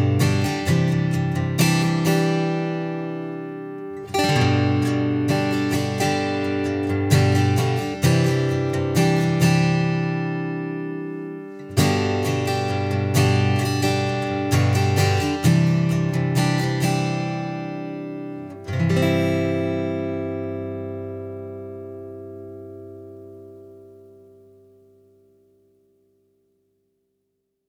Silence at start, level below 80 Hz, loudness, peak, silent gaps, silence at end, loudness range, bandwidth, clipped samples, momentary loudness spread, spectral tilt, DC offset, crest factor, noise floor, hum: 0 s; -54 dBFS; -21 LUFS; -4 dBFS; none; 3.75 s; 12 LU; 16.5 kHz; under 0.1%; 15 LU; -6 dB/octave; under 0.1%; 18 dB; -75 dBFS; 50 Hz at -50 dBFS